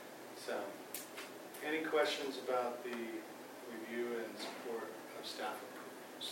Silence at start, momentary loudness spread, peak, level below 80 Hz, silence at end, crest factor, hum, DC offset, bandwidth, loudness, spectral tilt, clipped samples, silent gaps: 0 s; 13 LU; -20 dBFS; under -90 dBFS; 0 s; 22 dB; none; under 0.1%; 16 kHz; -42 LUFS; -2.5 dB/octave; under 0.1%; none